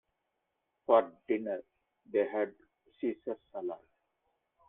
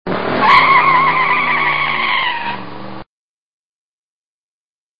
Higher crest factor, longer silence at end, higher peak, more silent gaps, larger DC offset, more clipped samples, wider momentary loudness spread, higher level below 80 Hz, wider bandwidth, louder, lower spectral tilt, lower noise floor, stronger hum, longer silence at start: first, 24 dB vs 16 dB; first, 0.9 s vs 0 s; second, -12 dBFS vs 0 dBFS; second, none vs 3.06-4.99 s; second, under 0.1% vs 3%; neither; second, 14 LU vs 19 LU; second, -80 dBFS vs -50 dBFS; second, 3.9 kHz vs 7.2 kHz; second, -34 LUFS vs -12 LUFS; first, -8.5 dB/octave vs -5.5 dB/octave; second, -83 dBFS vs under -90 dBFS; neither; first, 0.9 s vs 0.05 s